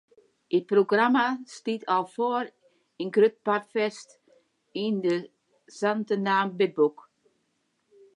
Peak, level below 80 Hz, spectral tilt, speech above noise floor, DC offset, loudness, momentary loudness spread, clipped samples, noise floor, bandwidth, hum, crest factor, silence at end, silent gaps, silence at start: -10 dBFS; -84 dBFS; -5.5 dB/octave; 49 dB; under 0.1%; -26 LUFS; 10 LU; under 0.1%; -74 dBFS; 10.5 kHz; none; 18 dB; 1.25 s; none; 0.5 s